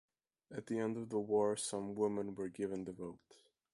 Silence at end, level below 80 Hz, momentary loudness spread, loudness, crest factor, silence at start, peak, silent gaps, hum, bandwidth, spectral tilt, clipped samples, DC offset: 0.4 s; -76 dBFS; 15 LU; -39 LUFS; 18 dB; 0.5 s; -24 dBFS; none; none; 11.5 kHz; -5 dB/octave; under 0.1%; under 0.1%